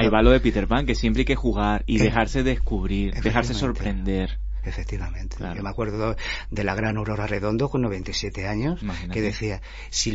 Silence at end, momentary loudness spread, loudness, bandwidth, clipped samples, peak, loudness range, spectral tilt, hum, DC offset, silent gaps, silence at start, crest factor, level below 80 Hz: 0 s; 10 LU; -25 LUFS; 8 kHz; under 0.1%; -4 dBFS; 6 LU; -5.5 dB/octave; none; under 0.1%; none; 0 s; 20 dB; -28 dBFS